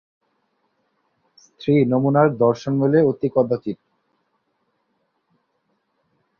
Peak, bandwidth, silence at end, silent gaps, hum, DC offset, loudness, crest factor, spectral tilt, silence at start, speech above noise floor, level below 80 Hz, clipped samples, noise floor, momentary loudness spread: -2 dBFS; 6.8 kHz; 2.65 s; none; none; under 0.1%; -19 LUFS; 20 dB; -9 dB/octave; 1.6 s; 52 dB; -62 dBFS; under 0.1%; -70 dBFS; 11 LU